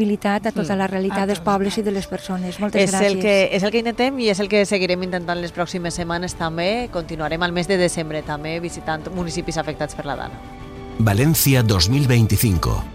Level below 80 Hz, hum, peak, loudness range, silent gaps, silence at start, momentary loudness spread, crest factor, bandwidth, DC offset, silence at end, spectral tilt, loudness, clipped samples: -38 dBFS; none; -4 dBFS; 5 LU; none; 0 s; 11 LU; 16 dB; 15.5 kHz; under 0.1%; 0 s; -5 dB/octave; -20 LUFS; under 0.1%